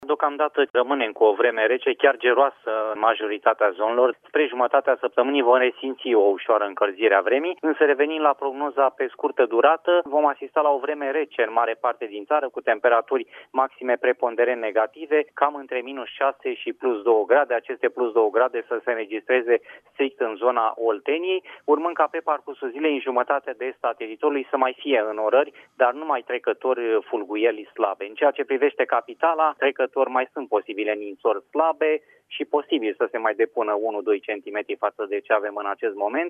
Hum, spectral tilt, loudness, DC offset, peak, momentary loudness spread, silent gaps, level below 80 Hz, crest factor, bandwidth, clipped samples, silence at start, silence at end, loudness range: none; -5 dB/octave; -23 LUFS; under 0.1%; -4 dBFS; 8 LU; 0.70-0.74 s; -84 dBFS; 18 dB; 3.7 kHz; under 0.1%; 0 s; 0 s; 4 LU